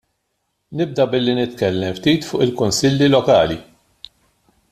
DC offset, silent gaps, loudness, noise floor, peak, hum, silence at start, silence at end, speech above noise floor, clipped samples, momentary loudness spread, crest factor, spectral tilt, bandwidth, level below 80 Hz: under 0.1%; none; -17 LUFS; -71 dBFS; -2 dBFS; none; 0.7 s; 1.1 s; 55 dB; under 0.1%; 9 LU; 16 dB; -5 dB/octave; 14.5 kHz; -50 dBFS